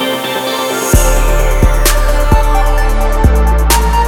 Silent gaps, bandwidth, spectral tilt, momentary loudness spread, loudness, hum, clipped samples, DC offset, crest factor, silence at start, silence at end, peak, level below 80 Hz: none; 18.5 kHz; -4 dB/octave; 4 LU; -12 LUFS; none; under 0.1%; under 0.1%; 10 dB; 0 s; 0 s; 0 dBFS; -10 dBFS